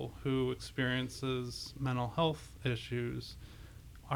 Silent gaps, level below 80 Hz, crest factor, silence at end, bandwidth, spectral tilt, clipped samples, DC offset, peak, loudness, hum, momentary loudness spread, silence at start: none; -54 dBFS; 18 dB; 0 s; 17.5 kHz; -6 dB/octave; under 0.1%; under 0.1%; -18 dBFS; -36 LUFS; none; 18 LU; 0 s